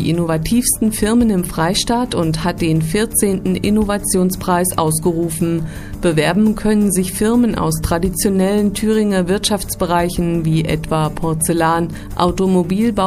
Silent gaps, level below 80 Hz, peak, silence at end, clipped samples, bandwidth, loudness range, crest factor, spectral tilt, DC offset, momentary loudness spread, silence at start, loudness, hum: none; -32 dBFS; 0 dBFS; 0 s; under 0.1%; 15.5 kHz; 1 LU; 16 dB; -5 dB/octave; under 0.1%; 4 LU; 0 s; -16 LUFS; none